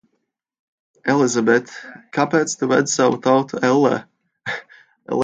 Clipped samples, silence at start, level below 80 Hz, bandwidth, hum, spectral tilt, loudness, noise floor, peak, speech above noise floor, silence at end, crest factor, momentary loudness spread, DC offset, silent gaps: under 0.1%; 1.05 s; -66 dBFS; 9.6 kHz; none; -4.5 dB/octave; -19 LUFS; -73 dBFS; -2 dBFS; 56 dB; 0 s; 18 dB; 13 LU; under 0.1%; none